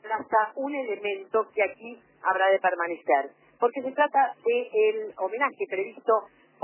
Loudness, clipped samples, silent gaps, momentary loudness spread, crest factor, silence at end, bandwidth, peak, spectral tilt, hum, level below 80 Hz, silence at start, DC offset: -26 LUFS; under 0.1%; none; 8 LU; 16 dB; 0.35 s; 3.2 kHz; -10 dBFS; -7 dB/octave; none; -82 dBFS; 0.05 s; under 0.1%